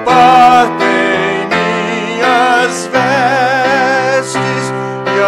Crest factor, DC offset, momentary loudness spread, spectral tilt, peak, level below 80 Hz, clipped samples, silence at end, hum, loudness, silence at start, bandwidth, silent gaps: 10 dB; under 0.1%; 9 LU; -4 dB/octave; 0 dBFS; -50 dBFS; under 0.1%; 0 s; none; -11 LUFS; 0 s; 13.5 kHz; none